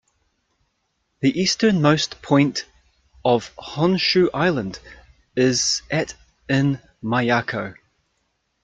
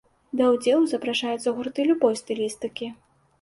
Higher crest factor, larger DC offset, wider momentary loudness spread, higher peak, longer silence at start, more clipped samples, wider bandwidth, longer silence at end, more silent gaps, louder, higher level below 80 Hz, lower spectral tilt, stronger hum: about the same, 18 dB vs 18 dB; neither; about the same, 14 LU vs 12 LU; first, -4 dBFS vs -8 dBFS; first, 1.2 s vs 0.35 s; neither; second, 9.4 kHz vs 11.5 kHz; first, 0.9 s vs 0.5 s; neither; first, -20 LUFS vs -24 LUFS; first, -54 dBFS vs -66 dBFS; about the same, -4.5 dB/octave vs -4 dB/octave; neither